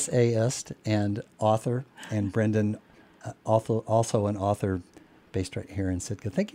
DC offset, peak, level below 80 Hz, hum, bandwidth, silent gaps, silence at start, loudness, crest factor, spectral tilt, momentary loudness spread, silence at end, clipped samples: under 0.1%; -8 dBFS; -58 dBFS; none; 14 kHz; none; 0 s; -28 LUFS; 20 dB; -6 dB/octave; 10 LU; 0.05 s; under 0.1%